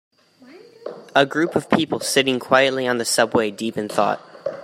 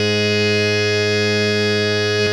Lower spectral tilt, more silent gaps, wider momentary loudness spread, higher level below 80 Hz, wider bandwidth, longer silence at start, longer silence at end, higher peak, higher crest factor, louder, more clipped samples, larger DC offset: about the same, -3.5 dB/octave vs -4.5 dB/octave; neither; first, 12 LU vs 1 LU; about the same, -64 dBFS vs -60 dBFS; first, 16 kHz vs 13.5 kHz; first, 0.5 s vs 0 s; about the same, 0 s vs 0 s; first, -2 dBFS vs -6 dBFS; first, 20 dB vs 12 dB; second, -20 LUFS vs -16 LUFS; neither; neither